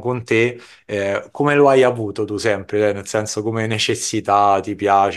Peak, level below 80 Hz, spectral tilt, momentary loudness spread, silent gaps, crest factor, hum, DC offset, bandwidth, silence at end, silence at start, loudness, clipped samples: -2 dBFS; -60 dBFS; -4.5 dB/octave; 10 LU; none; 16 dB; none; under 0.1%; 12.5 kHz; 0 s; 0 s; -18 LUFS; under 0.1%